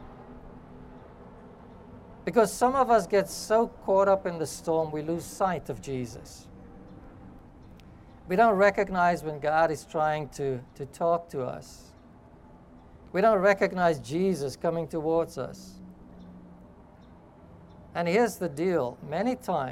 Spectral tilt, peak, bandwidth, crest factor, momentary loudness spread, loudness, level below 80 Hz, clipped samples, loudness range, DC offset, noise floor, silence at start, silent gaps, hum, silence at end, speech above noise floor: -5.5 dB/octave; -10 dBFS; 16.5 kHz; 20 dB; 25 LU; -27 LUFS; -56 dBFS; under 0.1%; 8 LU; under 0.1%; -52 dBFS; 0 s; none; none; 0 s; 26 dB